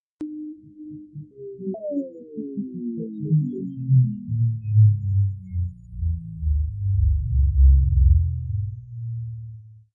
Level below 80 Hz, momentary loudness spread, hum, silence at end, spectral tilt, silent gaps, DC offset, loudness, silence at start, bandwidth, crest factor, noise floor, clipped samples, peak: -26 dBFS; 20 LU; none; 0.2 s; -15 dB/octave; none; under 0.1%; -23 LUFS; 0.2 s; 0.8 kHz; 16 dB; -41 dBFS; under 0.1%; -6 dBFS